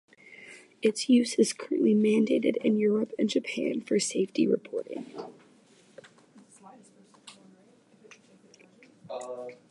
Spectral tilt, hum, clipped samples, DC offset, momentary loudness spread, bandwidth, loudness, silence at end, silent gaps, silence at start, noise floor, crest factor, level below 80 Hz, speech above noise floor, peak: -5 dB/octave; none; under 0.1%; under 0.1%; 19 LU; 11.5 kHz; -27 LUFS; 0.15 s; none; 0.3 s; -60 dBFS; 18 dB; -82 dBFS; 34 dB; -10 dBFS